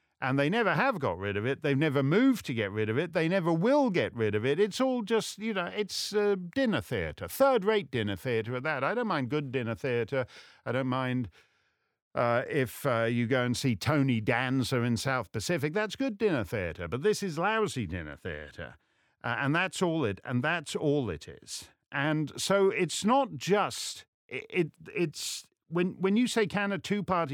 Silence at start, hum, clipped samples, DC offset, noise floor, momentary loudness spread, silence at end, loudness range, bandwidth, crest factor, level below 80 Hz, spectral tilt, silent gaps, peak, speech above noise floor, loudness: 0.2 s; none; under 0.1%; under 0.1%; -74 dBFS; 10 LU; 0 s; 4 LU; 19 kHz; 18 dB; -60 dBFS; -5.5 dB/octave; 12.02-12.11 s, 24.08-24.29 s; -12 dBFS; 45 dB; -29 LUFS